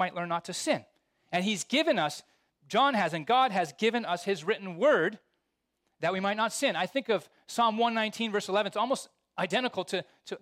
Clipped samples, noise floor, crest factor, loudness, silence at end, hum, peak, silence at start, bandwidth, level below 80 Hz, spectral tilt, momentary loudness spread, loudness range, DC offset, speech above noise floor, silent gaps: under 0.1%; -81 dBFS; 16 dB; -29 LUFS; 0.05 s; none; -14 dBFS; 0 s; 16 kHz; -80 dBFS; -3.5 dB/octave; 8 LU; 2 LU; under 0.1%; 52 dB; none